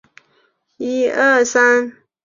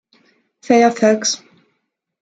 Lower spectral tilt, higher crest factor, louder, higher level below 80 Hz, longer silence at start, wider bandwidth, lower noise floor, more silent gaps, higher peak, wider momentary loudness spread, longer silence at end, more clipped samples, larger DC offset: about the same, -2 dB/octave vs -3 dB/octave; about the same, 16 dB vs 18 dB; about the same, -15 LUFS vs -15 LUFS; about the same, -66 dBFS vs -66 dBFS; about the same, 0.8 s vs 0.7 s; second, 7.6 kHz vs 9.2 kHz; second, -61 dBFS vs -72 dBFS; neither; about the same, -2 dBFS vs 0 dBFS; first, 14 LU vs 8 LU; second, 0.35 s vs 0.85 s; neither; neither